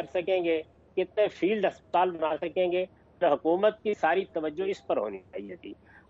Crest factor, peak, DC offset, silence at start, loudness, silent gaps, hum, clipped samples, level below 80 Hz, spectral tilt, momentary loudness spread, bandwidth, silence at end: 16 dB; -12 dBFS; under 0.1%; 0 s; -28 LUFS; none; none; under 0.1%; -66 dBFS; -6.5 dB/octave; 13 LU; 7.8 kHz; 0.35 s